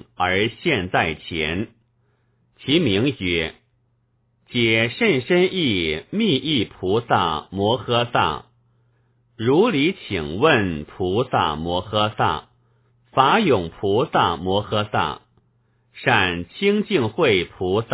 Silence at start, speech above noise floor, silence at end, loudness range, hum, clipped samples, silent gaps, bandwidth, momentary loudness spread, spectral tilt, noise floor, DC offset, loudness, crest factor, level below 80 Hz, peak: 0.2 s; 45 dB; 0 s; 2 LU; none; under 0.1%; none; 4 kHz; 8 LU; -9.5 dB/octave; -65 dBFS; under 0.1%; -20 LUFS; 20 dB; -46 dBFS; -2 dBFS